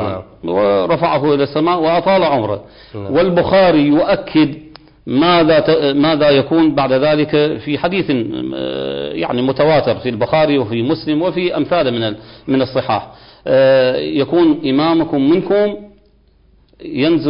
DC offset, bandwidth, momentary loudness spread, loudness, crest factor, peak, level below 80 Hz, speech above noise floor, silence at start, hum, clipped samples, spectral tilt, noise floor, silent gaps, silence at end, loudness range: under 0.1%; 5.4 kHz; 10 LU; -14 LUFS; 10 dB; -4 dBFS; -46 dBFS; 37 dB; 0 s; none; under 0.1%; -11.5 dB/octave; -51 dBFS; none; 0 s; 3 LU